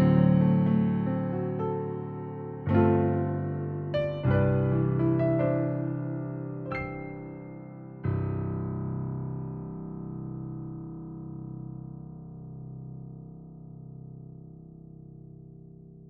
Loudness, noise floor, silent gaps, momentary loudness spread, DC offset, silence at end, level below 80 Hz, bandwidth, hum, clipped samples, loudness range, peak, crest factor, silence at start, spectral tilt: -29 LUFS; -49 dBFS; none; 22 LU; under 0.1%; 0 s; -52 dBFS; 4.5 kHz; none; under 0.1%; 17 LU; -10 dBFS; 18 dB; 0 s; -9 dB/octave